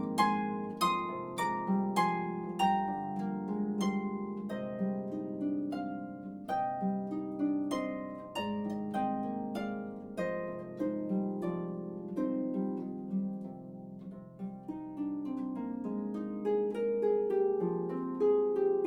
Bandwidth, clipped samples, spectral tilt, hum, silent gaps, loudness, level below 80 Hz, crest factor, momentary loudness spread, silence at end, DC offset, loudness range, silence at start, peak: 17.5 kHz; under 0.1%; -6.5 dB/octave; none; none; -34 LUFS; -70 dBFS; 18 dB; 11 LU; 0 s; under 0.1%; 6 LU; 0 s; -16 dBFS